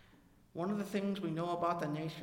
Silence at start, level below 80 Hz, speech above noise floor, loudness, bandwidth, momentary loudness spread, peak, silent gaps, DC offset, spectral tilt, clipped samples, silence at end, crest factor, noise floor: 0.55 s; -70 dBFS; 27 dB; -37 LUFS; 16.5 kHz; 5 LU; -22 dBFS; none; under 0.1%; -7 dB/octave; under 0.1%; 0 s; 16 dB; -64 dBFS